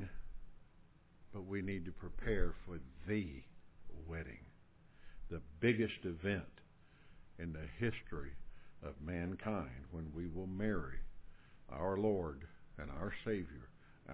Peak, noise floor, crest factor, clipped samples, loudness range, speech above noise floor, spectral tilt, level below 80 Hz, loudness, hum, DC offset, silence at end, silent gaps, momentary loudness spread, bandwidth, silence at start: -20 dBFS; -64 dBFS; 22 dB; under 0.1%; 4 LU; 24 dB; -6 dB/octave; -52 dBFS; -43 LUFS; none; under 0.1%; 0 s; none; 20 LU; 4 kHz; 0 s